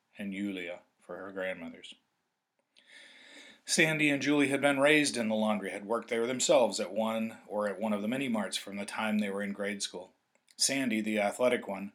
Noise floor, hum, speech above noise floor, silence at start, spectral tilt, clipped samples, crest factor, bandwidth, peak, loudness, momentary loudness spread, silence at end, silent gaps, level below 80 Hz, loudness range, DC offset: -82 dBFS; none; 51 dB; 0.15 s; -3.5 dB/octave; under 0.1%; 22 dB; 17 kHz; -10 dBFS; -30 LUFS; 17 LU; 0.05 s; none; -88 dBFS; 8 LU; under 0.1%